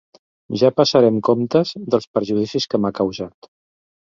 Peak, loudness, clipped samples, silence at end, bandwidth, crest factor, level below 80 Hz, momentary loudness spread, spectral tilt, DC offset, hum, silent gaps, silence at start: -2 dBFS; -18 LUFS; under 0.1%; 0.9 s; 7.6 kHz; 18 dB; -58 dBFS; 9 LU; -6 dB/octave; under 0.1%; none; 2.07-2.14 s; 0.5 s